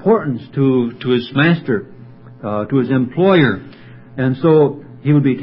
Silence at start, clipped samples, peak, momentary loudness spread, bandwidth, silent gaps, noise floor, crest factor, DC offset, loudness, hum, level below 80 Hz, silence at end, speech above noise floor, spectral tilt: 0 s; under 0.1%; 0 dBFS; 11 LU; 5.6 kHz; none; -38 dBFS; 16 dB; under 0.1%; -16 LUFS; none; -54 dBFS; 0 s; 23 dB; -12 dB/octave